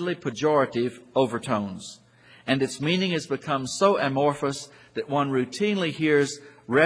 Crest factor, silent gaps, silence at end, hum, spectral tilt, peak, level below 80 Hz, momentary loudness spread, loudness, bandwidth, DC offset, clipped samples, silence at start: 20 dB; none; 0 s; none; -5 dB/octave; -6 dBFS; -66 dBFS; 13 LU; -25 LUFS; 10.5 kHz; under 0.1%; under 0.1%; 0 s